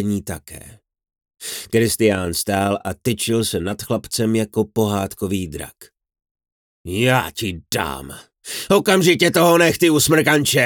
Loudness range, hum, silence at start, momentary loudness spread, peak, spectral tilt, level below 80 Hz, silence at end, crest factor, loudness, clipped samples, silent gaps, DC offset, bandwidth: 7 LU; none; 0 s; 18 LU; -2 dBFS; -4 dB/octave; -50 dBFS; 0 s; 18 dB; -18 LUFS; under 0.1%; 6.31-6.35 s, 6.52-6.84 s; under 0.1%; over 20 kHz